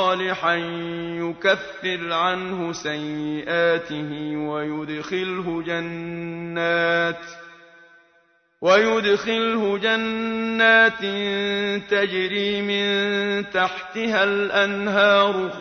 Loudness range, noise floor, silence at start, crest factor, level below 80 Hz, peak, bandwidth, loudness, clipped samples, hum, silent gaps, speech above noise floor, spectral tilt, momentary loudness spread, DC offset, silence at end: 6 LU; -61 dBFS; 0 s; 20 dB; -62 dBFS; -4 dBFS; 6.6 kHz; -21 LUFS; under 0.1%; none; none; 39 dB; -4.5 dB/octave; 12 LU; under 0.1%; 0 s